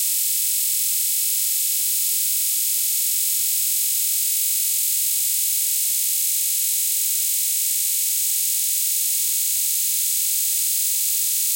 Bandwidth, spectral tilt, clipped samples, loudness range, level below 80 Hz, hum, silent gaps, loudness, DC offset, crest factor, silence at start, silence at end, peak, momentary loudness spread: 16.5 kHz; 10.5 dB/octave; under 0.1%; 0 LU; under -90 dBFS; none; none; -18 LUFS; under 0.1%; 14 dB; 0 s; 0 s; -8 dBFS; 0 LU